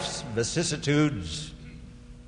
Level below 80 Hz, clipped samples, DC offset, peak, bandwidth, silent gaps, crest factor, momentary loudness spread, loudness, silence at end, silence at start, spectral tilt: -46 dBFS; under 0.1%; under 0.1%; -12 dBFS; 10.5 kHz; none; 18 dB; 21 LU; -28 LUFS; 0 s; 0 s; -4.5 dB/octave